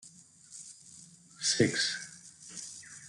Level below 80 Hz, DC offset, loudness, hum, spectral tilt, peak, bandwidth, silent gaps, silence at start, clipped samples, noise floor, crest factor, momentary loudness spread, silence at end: -72 dBFS; under 0.1%; -31 LUFS; none; -2.5 dB/octave; -12 dBFS; 12 kHz; none; 0.05 s; under 0.1%; -56 dBFS; 24 dB; 24 LU; 0 s